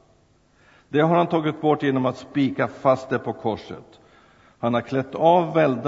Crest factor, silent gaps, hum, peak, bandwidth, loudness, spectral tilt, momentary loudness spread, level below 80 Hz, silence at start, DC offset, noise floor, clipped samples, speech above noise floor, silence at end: 18 dB; none; none; -4 dBFS; 7.8 kHz; -22 LUFS; -8 dB/octave; 10 LU; -62 dBFS; 0.9 s; under 0.1%; -59 dBFS; under 0.1%; 38 dB; 0 s